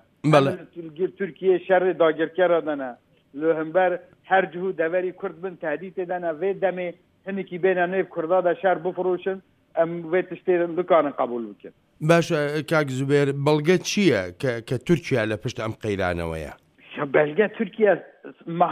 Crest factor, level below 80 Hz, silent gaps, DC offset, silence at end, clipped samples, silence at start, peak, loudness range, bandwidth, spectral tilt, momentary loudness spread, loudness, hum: 20 dB; -56 dBFS; none; under 0.1%; 0 s; under 0.1%; 0.25 s; -2 dBFS; 4 LU; 14 kHz; -6 dB/octave; 12 LU; -23 LUFS; none